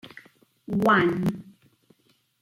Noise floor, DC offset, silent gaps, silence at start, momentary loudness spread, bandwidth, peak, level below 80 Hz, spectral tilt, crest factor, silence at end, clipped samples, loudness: -66 dBFS; under 0.1%; none; 0.05 s; 21 LU; 16.5 kHz; -8 dBFS; -60 dBFS; -7 dB/octave; 18 dB; 1 s; under 0.1%; -23 LUFS